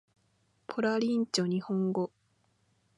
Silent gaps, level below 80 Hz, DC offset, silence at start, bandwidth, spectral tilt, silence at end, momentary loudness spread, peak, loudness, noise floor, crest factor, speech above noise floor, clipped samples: none; -80 dBFS; under 0.1%; 0.7 s; 11.5 kHz; -5.5 dB/octave; 0.9 s; 10 LU; -16 dBFS; -31 LUFS; -72 dBFS; 18 dB; 42 dB; under 0.1%